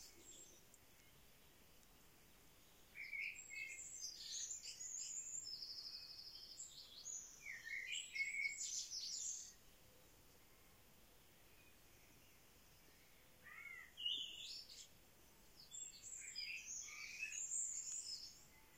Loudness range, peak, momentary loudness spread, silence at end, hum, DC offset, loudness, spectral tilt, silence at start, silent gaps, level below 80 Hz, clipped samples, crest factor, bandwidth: 16 LU; -32 dBFS; 24 LU; 0 s; none; under 0.1%; -48 LUFS; 2 dB/octave; 0 s; none; -78 dBFS; under 0.1%; 22 dB; 16.5 kHz